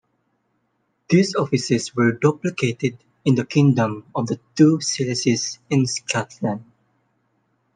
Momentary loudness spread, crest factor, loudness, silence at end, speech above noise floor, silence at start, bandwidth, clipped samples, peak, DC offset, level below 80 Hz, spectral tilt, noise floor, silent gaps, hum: 10 LU; 18 dB; -21 LUFS; 1.15 s; 50 dB; 1.1 s; 10 kHz; under 0.1%; -4 dBFS; under 0.1%; -64 dBFS; -5.5 dB/octave; -70 dBFS; none; none